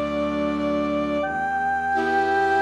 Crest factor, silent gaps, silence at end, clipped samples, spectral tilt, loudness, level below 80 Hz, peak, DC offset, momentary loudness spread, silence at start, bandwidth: 12 dB; none; 0 s; under 0.1%; -6 dB/octave; -23 LUFS; -48 dBFS; -10 dBFS; under 0.1%; 4 LU; 0 s; 10 kHz